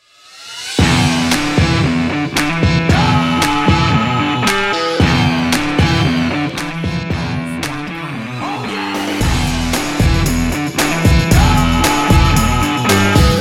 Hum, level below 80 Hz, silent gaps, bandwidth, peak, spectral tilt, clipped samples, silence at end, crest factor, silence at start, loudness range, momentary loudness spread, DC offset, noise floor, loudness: none; -24 dBFS; none; 16.5 kHz; 0 dBFS; -5 dB/octave; under 0.1%; 0 s; 14 dB; 0.35 s; 6 LU; 9 LU; under 0.1%; -38 dBFS; -14 LUFS